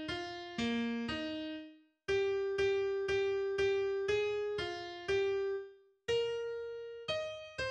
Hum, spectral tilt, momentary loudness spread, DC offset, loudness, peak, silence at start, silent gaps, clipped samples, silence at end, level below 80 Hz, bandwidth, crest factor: none; -4.5 dB/octave; 10 LU; under 0.1%; -36 LUFS; -22 dBFS; 0 s; none; under 0.1%; 0 s; -62 dBFS; 9 kHz; 14 dB